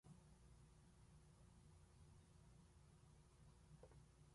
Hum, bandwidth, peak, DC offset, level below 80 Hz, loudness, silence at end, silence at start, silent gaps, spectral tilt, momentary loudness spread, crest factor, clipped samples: none; 11.5 kHz; -52 dBFS; under 0.1%; -74 dBFS; -69 LUFS; 0 s; 0.05 s; none; -5.5 dB/octave; 2 LU; 16 dB; under 0.1%